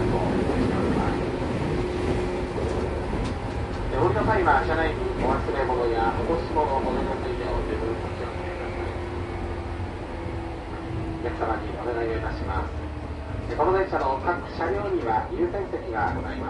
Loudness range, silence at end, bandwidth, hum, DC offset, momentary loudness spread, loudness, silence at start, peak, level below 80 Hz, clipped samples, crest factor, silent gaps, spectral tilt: 7 LU; 0 s; 11.5 kHz; none; under 0.1%; 10 LU; -27 LUFS; 0 s; -8 dBFS; -34 dBFS; under 0.1%; 18 dB; none; -7.5 dB/octave